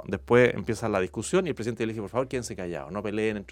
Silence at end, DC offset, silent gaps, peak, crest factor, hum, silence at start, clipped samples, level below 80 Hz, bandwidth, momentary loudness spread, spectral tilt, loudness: 0 s; under 0.1%; none; -6 dBFS; 20 dB; none; 0 s; under 0.1%; -52 dBFS; 14.5 kHz; 12 LU; -5.5 dB/octave; -27 LUFS